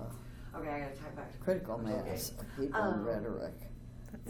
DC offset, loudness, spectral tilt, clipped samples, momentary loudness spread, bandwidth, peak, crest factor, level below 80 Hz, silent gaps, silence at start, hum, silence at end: under 0.1%; -38 LUFS; -5.5 dB/octave; under 0.1%; 15 LU; 19.5 kHz; -20 dBFS; 18 dB; -52 dBFS; none; 0 s; none; 0 s